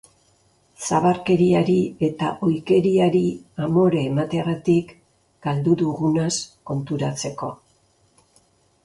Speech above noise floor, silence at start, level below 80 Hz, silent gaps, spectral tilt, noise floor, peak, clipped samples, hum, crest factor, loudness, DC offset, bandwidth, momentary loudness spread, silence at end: 41 dB; 0.8 s; -56 dBFS; none; -6.5 dB/octave; -61 dBFS; -6 dBFS; under 0.1%; none; 16 dB; -21 LUFS; under 0.1%; 11.5 kHz; 11 LU; 1.3 s